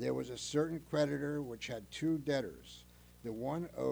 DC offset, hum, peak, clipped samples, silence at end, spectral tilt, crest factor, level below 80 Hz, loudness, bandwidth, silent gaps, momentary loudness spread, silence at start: under 0.1%; 60 Hz at -60 dBFS; -20 dBFS; under 0.1%; 0 s; -5.5 dB/octave; 16 dB; -64 dBFS; -38 LUFS; over 20 kHz; none; 13 LU; 0 s